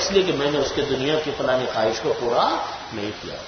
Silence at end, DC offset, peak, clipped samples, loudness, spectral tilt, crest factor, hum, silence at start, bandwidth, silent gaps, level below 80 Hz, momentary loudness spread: 0 s; under 0.1%; -4 dBFS; under 0.1%; -23 LUFS; -4 dB/octave; 18 dB; none; 0 s; 6.6 kHz; none; -50 dBFS; 10 LU